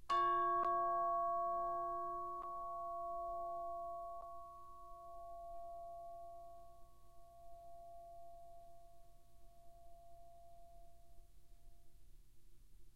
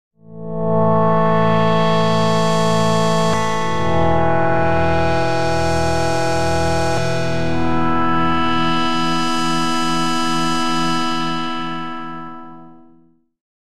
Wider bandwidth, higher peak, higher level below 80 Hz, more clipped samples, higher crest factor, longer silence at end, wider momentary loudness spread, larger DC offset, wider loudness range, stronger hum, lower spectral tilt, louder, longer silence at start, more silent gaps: first, 15.5 kHz vs 13.5 kHz; second, -28 dBFS vs -4 dBFS; second, -64 dBFS vs -38 dBFS; neither; first, 18 dB vs 12 dB; second, 0 s vs 0.3 s; first, 27 LU vs 8 LU; second, 0.1% vs 8%; first, 26 LU vs 4 LU; neither; about the same, -5 dB/octave vs -5.5 dB/octave; second, -42 LUFS vs -18 LUFS; about the same, 0 s vs 0.1 s; neither